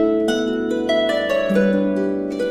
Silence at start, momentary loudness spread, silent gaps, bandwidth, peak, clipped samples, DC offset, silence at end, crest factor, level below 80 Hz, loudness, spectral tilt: 0 s; 4 LU; none; 15.5 kHz; -6 dBFS; under 0.1%; under 0.1%; 0 s; 12 dB; -50 dBFS; -19 LUFS; -6 dB/octave